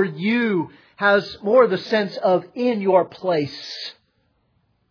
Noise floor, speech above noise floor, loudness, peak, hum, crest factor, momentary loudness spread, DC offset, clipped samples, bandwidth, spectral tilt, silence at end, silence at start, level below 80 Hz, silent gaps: -66 dBFS; 46 dB; -20 LUFS; -4 dBFS; none; 18 dB; 14 LU; under 0.1%; under 0.1%; 5.4 kHz; -6.5 dB/octave; 1 s; 0 s; -68 dBFS; none